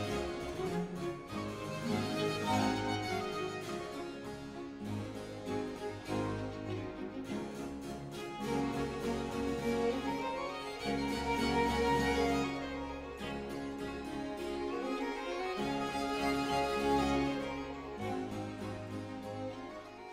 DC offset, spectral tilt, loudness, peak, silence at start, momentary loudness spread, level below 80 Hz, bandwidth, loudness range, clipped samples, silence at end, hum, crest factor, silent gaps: under 0.1%; -5.5 dB/octave; -37 LUFS; -20 dBFS; 0 s; 11 LU; -54 dBFS; 16 kHz; 6 LU; under 0.1%; 0 s; none; 18 dB; none